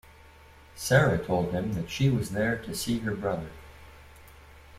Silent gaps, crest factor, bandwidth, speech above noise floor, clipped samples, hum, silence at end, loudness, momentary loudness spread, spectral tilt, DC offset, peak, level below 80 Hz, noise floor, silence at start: none; 22 dB; 16 kHz; 26 dB; under 0.1%; none; 0 s; -28 LUFS; 13 LU; -5.5 dB/octave; under 0.1%; -6 dBFS; -50 dBFS; -52 dBFS; 0.25 s